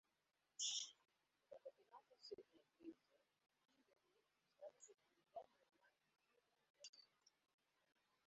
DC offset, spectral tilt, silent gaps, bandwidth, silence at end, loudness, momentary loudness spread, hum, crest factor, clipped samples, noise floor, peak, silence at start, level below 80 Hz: under 0.1%; 1 dB/octave; 6.70-6.74 s, 6.89-6.93 s; 7.6 kHz; 1.2 s; -54 LUFS; 19 LU; none; 28 dB; under 0.1%; -89 dBFS; -34 dBFS; 0.6 s; under -90 dBFS